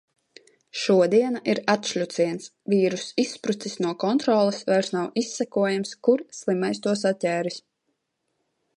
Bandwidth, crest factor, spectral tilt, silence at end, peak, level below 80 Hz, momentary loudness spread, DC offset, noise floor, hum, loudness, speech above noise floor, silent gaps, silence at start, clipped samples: 11 kHz; 18 dB; -5 dB/octave; 1.2 s; -6 dBFS; -74 dBFS; 8 LU; under 0.1%; -76 dBFS; none; -24 LUFS; 53 dB; none; 0.75 s; under 0.1%